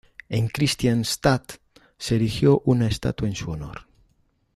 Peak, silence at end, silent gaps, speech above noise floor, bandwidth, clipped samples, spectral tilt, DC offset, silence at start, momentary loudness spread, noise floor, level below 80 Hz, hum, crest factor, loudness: -6 dBFS; 0.75 s; none; 43 dB; 14.5 kHz; under 0.1%; -5.5 dB/octave; under 0.1%; 0.3 s; 15 LU; -65 dBFS; -44 dBFS; none; 18 dB; -23 LUFS